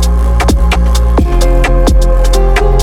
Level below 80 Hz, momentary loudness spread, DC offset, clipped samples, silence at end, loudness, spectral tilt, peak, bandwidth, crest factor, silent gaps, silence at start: -8 dBFS; 1 LU; under 0.1%; under 0.1%; 0 s; -11 LUFS; -5.5 dB/octave; 0 dBFS; 14.5 kHz; 8 dB; none; 0 s